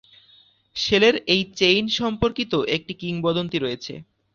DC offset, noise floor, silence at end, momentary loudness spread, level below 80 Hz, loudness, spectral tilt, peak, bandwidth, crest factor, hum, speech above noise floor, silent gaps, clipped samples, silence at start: under 0.1%; -56 dBFS; 0.3 s; 14 LU; -50 dBFS; -21 LUFS; -4.5 dB/octave; -4 dBFS; 7.4 kHz; 20 dB; none; 34 dB; none; under 0.1%; 0.75 s